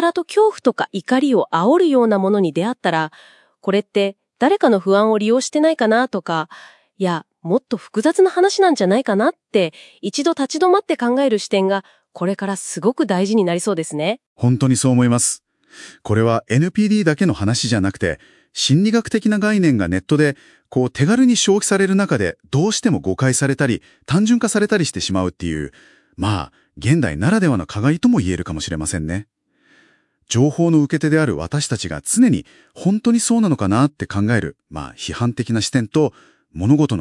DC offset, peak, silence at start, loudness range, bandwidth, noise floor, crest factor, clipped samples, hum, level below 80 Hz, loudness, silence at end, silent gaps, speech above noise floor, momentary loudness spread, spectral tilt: under 0.1%; 0 dBFS; 0 s; 3 LU; 12 kHz; -57 dBFS; 16 dB; under 0.1%; none; -50 dBFS; -18 LUFS; 0 s; 14.26-14.36 s; 40 dB; 9 LU; -5.5 dB/octave